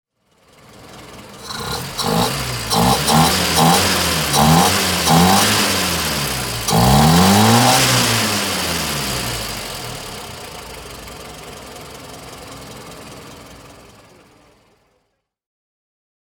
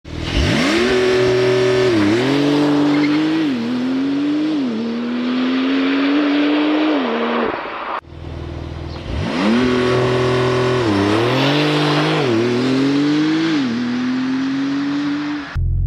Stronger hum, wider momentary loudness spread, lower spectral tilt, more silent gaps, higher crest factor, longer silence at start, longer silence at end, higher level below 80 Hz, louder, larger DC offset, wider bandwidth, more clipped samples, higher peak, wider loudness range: neither; first, 23 LU vs 8 LU; second, -3.5 dB/octave vs -6 dB/octave; neither; about the same, 18 dB vs 14 dB; first, 0.8 s vs 0.05 s; first, 2.65 s vs 0 s; about the same, -36 dBFS vs -34 dBFS; about the same, -15 LUFS vs -17 LUFS; neither; first, 19.5 kHz vs 11 kHz; neither; first, 0 dBFS vs -4 dBFS; first, 21 LU vs 4 LU